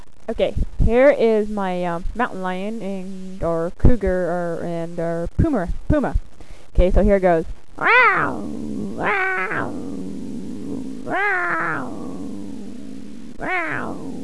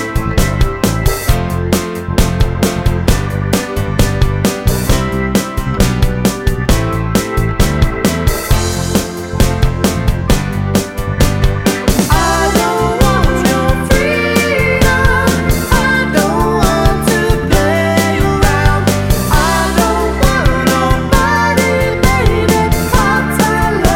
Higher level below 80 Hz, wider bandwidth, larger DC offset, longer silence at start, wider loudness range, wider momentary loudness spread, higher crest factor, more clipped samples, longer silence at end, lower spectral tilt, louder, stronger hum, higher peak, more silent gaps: second, -28 dBFS vs -18 dBFS; second, 11 kHz vs 17 kHz; first, 3% vs under 0.1%; first, 0.15 s vs 0 s; first, 7 LU vs 3 LU; first, 16 LU vs 4 LU; first, 18 dB vs 12 dB; neither; about the same, 0 s vs 0 s; first, -7 dB/octave vs -5 dB/octave; second, -21 LUFS vs -13 LUFS; neither; about the same, -2 dBFS vs 0 dBFS; neither